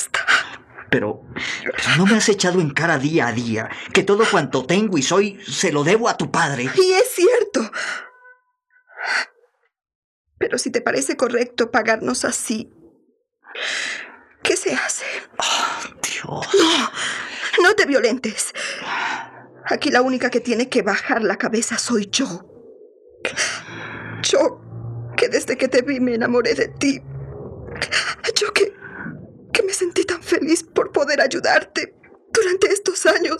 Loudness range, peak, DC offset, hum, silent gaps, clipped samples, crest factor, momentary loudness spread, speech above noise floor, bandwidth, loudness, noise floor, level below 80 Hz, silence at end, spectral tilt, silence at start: 5 LU; -2 dBFS; under 0.1%; none; 9.95-10.25 s; under 0.1%; 20 dB; 13 LU; 43 dB; 14 kHz; -19 LUFS; -62 dBFS; -58 dBFS; 0 s; -3.5 dB/octave; 0 s